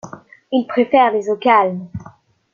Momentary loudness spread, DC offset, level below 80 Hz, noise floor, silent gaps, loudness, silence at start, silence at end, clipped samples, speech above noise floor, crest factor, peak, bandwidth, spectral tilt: 20 LU; under 0.1%; -58 dBFS; -45 dBFS; none; -16 LUFS; 0.05 s; 0.45 s; under 0.1%; 30 dB; 16 dB; -2 dBFS; 7.2 kHz; -6.5 dB/octave